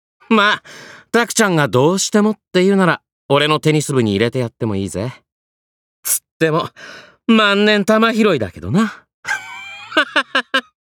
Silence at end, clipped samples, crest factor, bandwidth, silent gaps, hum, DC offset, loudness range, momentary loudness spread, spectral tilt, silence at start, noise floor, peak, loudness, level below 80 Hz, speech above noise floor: 0.35 s; under 0.1%; 14 dB; over 20 kHz; 3.12-3.29 s, 5.32-6.03 s, 6.31-6.40 s, 9.14-9.23 s; none; under 0.1%; 4 LU; 13 LU; -4.5 dB/octave; 0.3 s; under -90 dBFS; -2 dBFS; -16 LUFS; -56 dBFS; over 75 dB